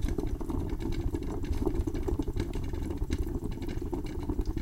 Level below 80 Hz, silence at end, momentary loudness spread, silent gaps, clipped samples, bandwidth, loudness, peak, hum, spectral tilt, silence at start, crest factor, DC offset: -34 dBFS; 0 s; 4 LU; none; under 0.1%; 16 kHz; -35 LUFS; -16 dBFS; none; -7.5 dB/octave; 0 s; 16 dB; under 0.1%